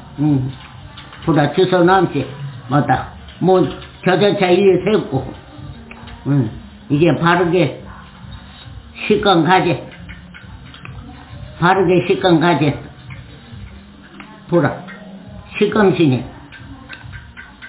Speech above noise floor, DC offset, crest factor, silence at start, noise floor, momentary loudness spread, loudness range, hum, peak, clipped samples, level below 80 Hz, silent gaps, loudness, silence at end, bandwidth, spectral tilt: 24 dB; under 0.1%; 16 dB; 0 s; -38 dBFS; 23 LU; 3 LU; none; -2 dBFS; under 0.1%; -42 dBFS; none; -15 LUFS; 0 s; 4 kHz; -11 dB/octave